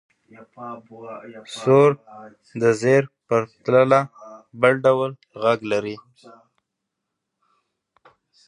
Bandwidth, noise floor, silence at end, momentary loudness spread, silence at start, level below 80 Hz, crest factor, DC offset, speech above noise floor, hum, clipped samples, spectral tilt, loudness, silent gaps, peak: 11 kHz; -81 dBFS; 2.5 s; 22 LU; 0.6 s; -68 dBFS; 20 dB; under 0.1%; 60 dB; none; under 0.1%; -6.5 dB/octave; -19 LUFS; none; -2 dBFS